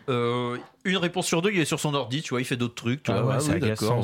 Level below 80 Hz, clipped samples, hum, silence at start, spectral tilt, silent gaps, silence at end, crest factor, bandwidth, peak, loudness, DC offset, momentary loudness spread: -60 dBFS; under 0.1%; none; 0.05 s; -5 dB/octave; none; 0 s; 14 dB; 16.5 kHz; -12 dBFS; -26 LUFS; under 0.1%; 5 LU